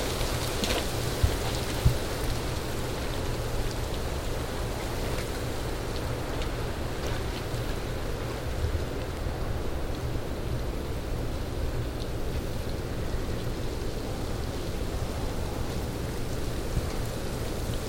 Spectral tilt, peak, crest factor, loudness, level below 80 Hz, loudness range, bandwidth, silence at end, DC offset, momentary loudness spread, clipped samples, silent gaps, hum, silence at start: -5 dB/octave; -10 dBFS; 20 dB; -32 LUFS; -34 dBFS; 4 LU; 17 kHz; 0 s; 0.2%; 6 LU; under 0.1%; none; none; 0 s